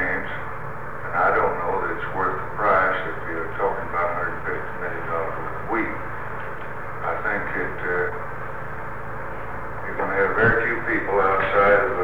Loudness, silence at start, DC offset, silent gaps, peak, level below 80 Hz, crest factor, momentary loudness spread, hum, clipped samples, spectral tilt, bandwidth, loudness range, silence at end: -24 LUFS; 0 s; 3%; none; -6 dBFS; -44 dBFS; 18 dB; 14 LU; none; under 0.1%; -7.5 dB/octave; 17.5 kHz; 5 LU; 0 s